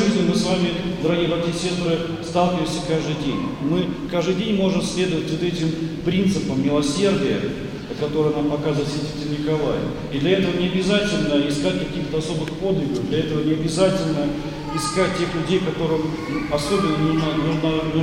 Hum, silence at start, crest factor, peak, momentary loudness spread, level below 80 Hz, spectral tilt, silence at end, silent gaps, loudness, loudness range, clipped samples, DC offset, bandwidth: none; 0 s; 16 dB; -4 dBFS; 6 LU; -42 dBFS; -6 dB/octave; 0 s; none; -22 LUFS; 1 LU; under 0.1%; under 0.1%; 15 kHz